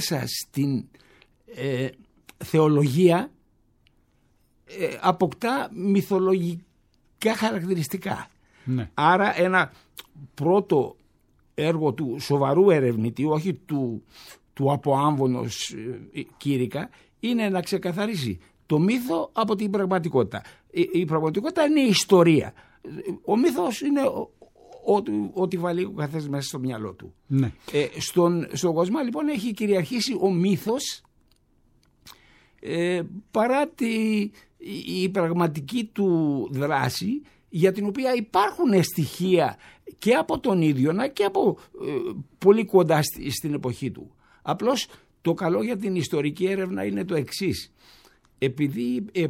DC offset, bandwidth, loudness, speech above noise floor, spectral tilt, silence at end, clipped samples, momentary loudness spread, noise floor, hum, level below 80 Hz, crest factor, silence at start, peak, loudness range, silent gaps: under 0.1%; 16.5 kHz; -24 LUFS; 40 dB; -6 dB/octave; 0 s; under 0.1%; 13 LU; -64 dBFS; none; -60 dBFS; 20 dB; 0 s; -4 dBFS; 5 LU; none